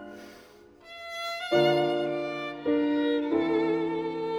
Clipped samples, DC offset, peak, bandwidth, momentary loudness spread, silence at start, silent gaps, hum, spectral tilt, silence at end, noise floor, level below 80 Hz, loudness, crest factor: under 0.1%; under 0.1%; -12 dBFS; 15 kHz; 17 LU; 0 s; none; none; -6 dB/octave; 0 s; -53 dBFS; -68 dBFS; -27 LUFS; 16 dB